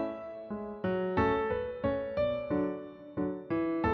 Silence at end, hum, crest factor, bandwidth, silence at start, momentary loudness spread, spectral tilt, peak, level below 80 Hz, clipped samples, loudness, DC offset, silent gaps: 0 s; none; 16 dB; 6.2 kHz; 0 s; 11 LU; -6 dB/octave; -16 dBFS; -54 dBFS; under 0.1%; -33 LUFS; under 0.1%; none